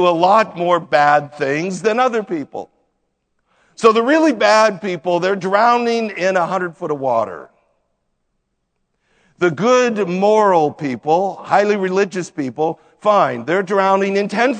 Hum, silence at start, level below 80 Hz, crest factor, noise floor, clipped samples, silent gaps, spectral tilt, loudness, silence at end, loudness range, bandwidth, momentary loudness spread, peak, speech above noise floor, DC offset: none; 0 s; -68 dBFS; 16 dB; -70 dBFS; under 0.1%; none; -5 dB/octave; -16 LUFS; 0 s; 5 LU; 9.4 kHz; 9 LU; 0 dBFS; 55 dB; under 0.1%